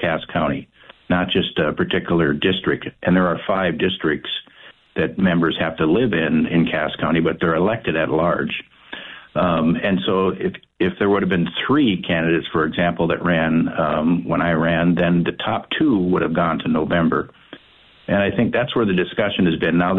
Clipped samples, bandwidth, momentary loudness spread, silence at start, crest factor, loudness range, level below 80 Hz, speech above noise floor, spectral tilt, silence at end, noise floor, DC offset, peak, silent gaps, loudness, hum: under 0.1%; 4.1 kHz; 6 LU; 0 s; 12 dB; 2 LU; -46 dBFS; 32 dB; -9.5 dB/octave; 0 s; -51 dBFS; under 0.1%; -6 dBFS; none; -19 LUFS; none